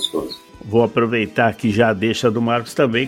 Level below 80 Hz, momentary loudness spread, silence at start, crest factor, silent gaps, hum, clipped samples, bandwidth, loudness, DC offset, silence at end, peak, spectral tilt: -52 dBFS; 7 LU; 0 s; 16 dB; none; none; under 0.1%; 16.5 kHz; -18 LUFS; under 0.1%; 0 s; -2 dBFS; -5.5 dB/octave